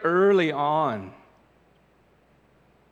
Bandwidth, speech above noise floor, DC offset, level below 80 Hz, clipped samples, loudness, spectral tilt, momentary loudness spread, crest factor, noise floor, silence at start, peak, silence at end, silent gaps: 7.6 kHz; 39 dB; under 0.1%; -70 dBFS; under 0.1%; -23 LUFS; -7 dB/octave; 16 LU; 16 dB; -61 dBFS; 0 s; -10 dBFS; 1.8 s; none